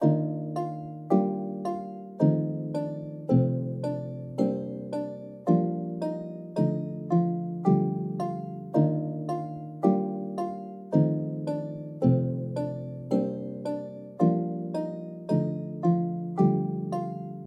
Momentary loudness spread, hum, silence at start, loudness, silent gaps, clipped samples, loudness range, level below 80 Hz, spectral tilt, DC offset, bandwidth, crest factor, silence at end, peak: 10 LU; none; 0 s; -29 LUFS; none; under 0.1%; 2 LU; -68 dBFS; -10.5 dB/octave; under 0.1%; 9.2 kHz; 18 dB; 0 s; -10 dBFS